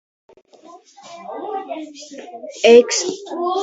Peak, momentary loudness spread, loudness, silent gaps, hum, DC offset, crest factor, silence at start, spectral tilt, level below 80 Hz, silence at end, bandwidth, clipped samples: 0 dBFS; 24 LU; -16 LUFS; none; none; under 0.1%; 20 dB; 0.75 s; -1.5 dB/octave; -70 dBFS; 0 s; 8 kHz; under 0.1%